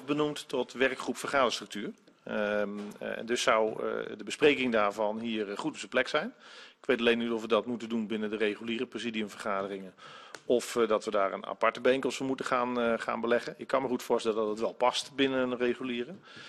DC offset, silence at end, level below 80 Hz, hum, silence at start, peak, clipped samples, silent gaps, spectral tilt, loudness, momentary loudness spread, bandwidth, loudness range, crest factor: under 0.1%; 0 s; -68 dBFS; none; 0 s; -10 dBFS; under 0.1%; none; -4 dB/octave; -31 LUFS; 11 LU; 13 kHz; 3 LU; 22 dB